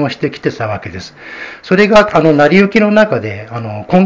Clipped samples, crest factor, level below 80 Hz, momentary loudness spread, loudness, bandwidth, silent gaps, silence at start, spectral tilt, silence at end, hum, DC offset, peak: 0.9%; 12 dB; -42 dBFS; 19 LU; -11 LUFS; 8 kHz; none; 0 s; -7 dB/octave; 0 s; none; under 0.1%; 0 dBFS